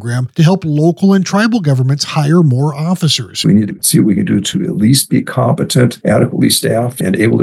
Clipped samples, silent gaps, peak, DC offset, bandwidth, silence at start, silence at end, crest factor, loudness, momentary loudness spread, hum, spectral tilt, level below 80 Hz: under 0.1%; none; 0 dBFS; under 0.1%; 14 kHz; 0 s; 0 s; 10 dB; -12 LUFS; 4 LU; none; -5.5 dB/octave; -50 dBFS